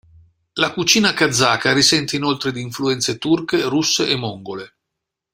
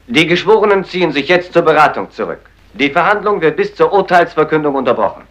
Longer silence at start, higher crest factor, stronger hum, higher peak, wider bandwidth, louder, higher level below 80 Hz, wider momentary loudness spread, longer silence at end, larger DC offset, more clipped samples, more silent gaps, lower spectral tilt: first, 0.55 s vs 0.1 s; first, 18 dB vs 12 dB; neither; about the same, 0 dBFS vs 0 dBFS; first, 16 kHz vs 12 kHz; second, -17 LUFS vs -12 LUFS; second, -56 dBFS vs -48 dBFS; first, 13 LU vs 8 LU; first, 0.65 s vs 0.1 s; neither; second, under 0.1% vs 0.1%; neither; second, -3 dB/octave vs -5.5 dB/octave